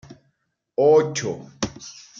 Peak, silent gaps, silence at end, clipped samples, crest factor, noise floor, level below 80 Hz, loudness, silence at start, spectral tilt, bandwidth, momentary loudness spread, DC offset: -6 dBFS; none; 0.3 s; under 0.1%; 18 dB; -71 dBFS; -56 dBFS; -21 LUFS; 0.1 s; -4.5 dB/octave; 7.6 kHz; 14 LU; under 0.1%